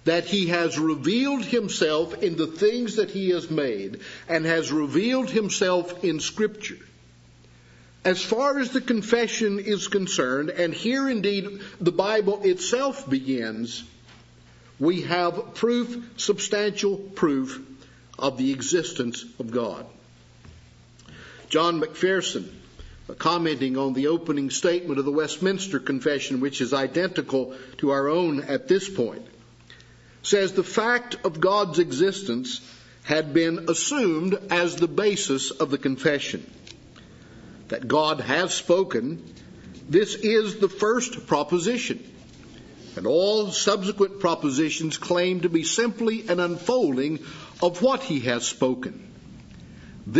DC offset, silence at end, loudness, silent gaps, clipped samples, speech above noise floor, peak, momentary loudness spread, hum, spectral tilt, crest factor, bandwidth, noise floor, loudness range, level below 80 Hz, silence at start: under 0.1%; 0 s; -24 LUFS; none; under 0.1%; 28 dB; -4 dBFS; 10 LU; none; -4 dB/octave; 20 dB; 8 kHz; -52 dBFS; 3 LU; -60 dBFS; 0.05 s